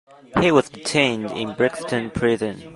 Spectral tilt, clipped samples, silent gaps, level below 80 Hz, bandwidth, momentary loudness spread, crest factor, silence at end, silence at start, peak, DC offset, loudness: -5 dB/octave; under 0.1%; none; -48 dBFS; 11.5 kHz; 8 LU; 20 dB; 0 s; 0.3 s; -2 dBFS; under 0.1%; -21 LUFS